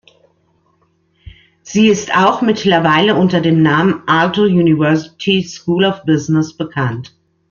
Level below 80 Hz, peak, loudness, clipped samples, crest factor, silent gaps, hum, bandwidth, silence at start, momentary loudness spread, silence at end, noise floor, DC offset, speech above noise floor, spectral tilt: -52 dBFS; 0 dBFS; -13 LUFS; under 0.1%; 14 dB; none; none; 7.2 kHz; 1.25 s; 8 LU; 0.45 s; -59 dBFS; under 0.1%; 46 dB; -6 dB/octave